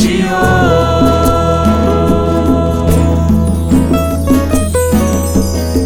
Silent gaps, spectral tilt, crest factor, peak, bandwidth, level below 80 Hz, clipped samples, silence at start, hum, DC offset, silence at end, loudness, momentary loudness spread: none; -6.5 dB/octave; 10 dB; 0 dBFS; 18.5 kHz; -20 dBFS; under 0.1%; 0 s; none; under 0.1%; 0 s; -11 LUFS; 3 LU